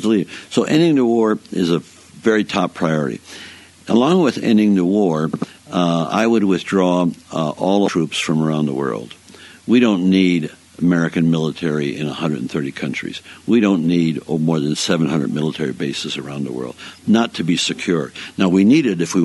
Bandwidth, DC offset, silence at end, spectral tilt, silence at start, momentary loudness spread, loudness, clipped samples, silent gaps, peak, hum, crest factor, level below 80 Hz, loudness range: 11.5 kHz; under 0.1%; 0 s; -6 dB/octave; 0 s; 11 LU; -18 LUFS; under 0.1%; none; -2 dBFS; none; 16 dB; -58 dBFS; 3 LU